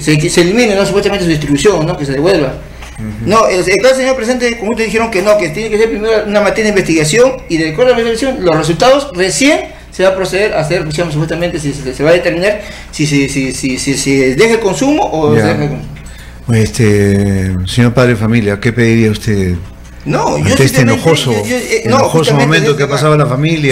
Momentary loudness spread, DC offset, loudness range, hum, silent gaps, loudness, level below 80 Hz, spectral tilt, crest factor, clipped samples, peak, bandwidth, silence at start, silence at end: 7 LU; under 0.1%; 2 LU; none; none; -11 LUFS; -32 dBFS; -5 dB/octave; 10 dB; under 0.1%; 0 dBFS; 16 kHz; 0 s; 0 s